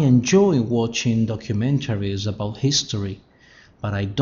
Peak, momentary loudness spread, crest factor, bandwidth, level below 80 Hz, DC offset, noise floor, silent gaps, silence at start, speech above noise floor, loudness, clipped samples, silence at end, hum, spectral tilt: -4 dBFS; 12 LU; 16 dB; 7.4 kHz; -50 dBFS; under 0.1%; -51 dBFS; none; 0 s; 31 dB; -21 LUFS; under 0.1%; 0 s; none; -6 dB/octave